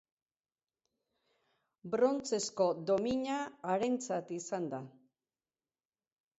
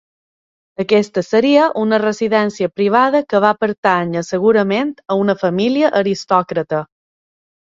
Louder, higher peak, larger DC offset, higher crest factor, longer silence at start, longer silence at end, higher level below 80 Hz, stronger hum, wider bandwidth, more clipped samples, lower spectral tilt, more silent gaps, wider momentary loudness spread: second, -35 LUFS vs -15 LUFS; second, -18 dBFS vs 0 dBFS; neither; about the same, 20 dB vs 16 dB; first, 1.85 s vs 0.8 s; first, 1.5 s vs 0.8 s; second, -74 dBFS vs -60 dBFS; neither; about the same, 8 kHz vs 7.8 kHz; neither; second, -4.5 dB/octave vs -6 dB/octave; second, none vs 3.78-3.83 s; first, 10 LU vs 7 LU